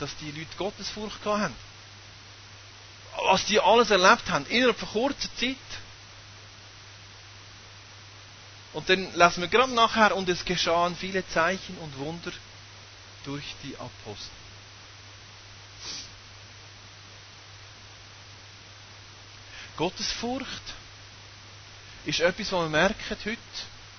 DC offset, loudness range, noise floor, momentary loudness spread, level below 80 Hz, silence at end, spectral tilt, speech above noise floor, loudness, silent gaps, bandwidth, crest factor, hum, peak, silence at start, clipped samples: under 0.1%; 19 LU; -48 dBFS; 25 LU; -54 dBFS; 0 s; -3.5 dB/octave; 21 dB; -26 LUFS; none; 6.6 kHz; 24 dB; none; -6 dBFS; 0 s; under 0.1%